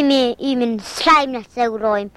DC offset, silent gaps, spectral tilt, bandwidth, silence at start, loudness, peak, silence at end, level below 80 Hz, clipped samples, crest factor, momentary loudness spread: under 0.1%; none; -3.5 dB/octave; 13.5 kHz; 0 s; -17 LUFS; -2 dBFS; 0.05 s; -50 dBFS; under 0.1%; 16 dB; 8 LU